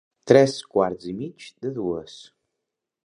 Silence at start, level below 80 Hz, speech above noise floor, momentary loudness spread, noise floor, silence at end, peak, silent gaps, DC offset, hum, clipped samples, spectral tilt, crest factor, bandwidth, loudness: 0.25 s; -60 dBFS; 61 dB; 17 LU; -83 dBFS; 0.9 s; 0 dBFS; none; under 0.1%; none; under 0.1%; -6 dB/octave; 24 dB; 11 kHz; -22 LUFS